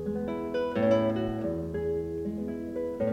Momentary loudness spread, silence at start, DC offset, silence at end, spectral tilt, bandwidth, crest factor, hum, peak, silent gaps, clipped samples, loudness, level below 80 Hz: 9 LU; 0 s; under 0.1%; 0 s; -8 dB/octave; 15.5 kHz; 16 dB; none; -14 dBFS; none; under 0.1%; -30 LUFS; -50 dBFS